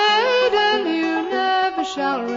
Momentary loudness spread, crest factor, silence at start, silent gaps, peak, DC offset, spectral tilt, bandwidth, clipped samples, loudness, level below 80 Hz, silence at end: 6 LU; 12 dB; 0 s; none; -6 dBFS; under 0.1%; -2.5 dB/octave; 7.6 kHz; under 0.1%; -19 LUFS; -58 dBFS; 0 s